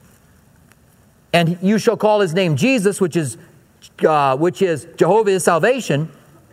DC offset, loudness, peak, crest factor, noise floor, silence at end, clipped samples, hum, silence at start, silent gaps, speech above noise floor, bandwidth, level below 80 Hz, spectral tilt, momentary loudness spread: under 0.1%; -17 LUFS; 0 dBFS; 18 dB; -52 dBFS; 0.4 s; under 0.1%; none; 1.35 s; none; 36 dB; 16 kHz; -60 dBFS; -5.5 dB/octave; 7 LU